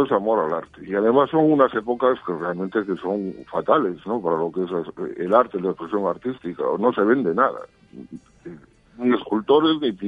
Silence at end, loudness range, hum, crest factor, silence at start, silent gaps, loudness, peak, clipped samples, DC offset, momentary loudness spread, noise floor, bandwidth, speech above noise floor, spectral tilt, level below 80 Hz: 0 s; 3 LU; none; 20 dB; 0 s; none; -22 LUFS; -2 dBFS; under 0.1%; under 0.1%; 12 LU; -44 dBFS; 5 kHz; 23 dB; -8 dB/octave; -60 dBFS